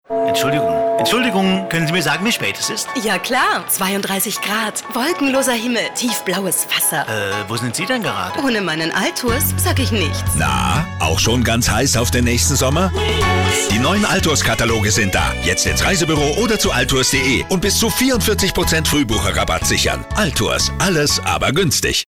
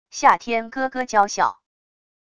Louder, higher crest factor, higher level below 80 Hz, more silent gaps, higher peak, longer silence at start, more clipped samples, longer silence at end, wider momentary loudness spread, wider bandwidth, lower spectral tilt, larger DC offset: first, -16 LUFS vs -20 LUFS; second, 10 dB vs 20 dB; first, -30 dBFS vs -60 dBFS; neither; second, -6 dBFS vs -2 dBFS; about the same, 0.1 s vs 0.15 s; neither; second, 0.05 s vs 0.8 s; second, 4 LU vs 8 LU; first, over 20 kHz vs 10 kHz; about the same, -3.5 dB/octave vs -2.5 dB/octave; neither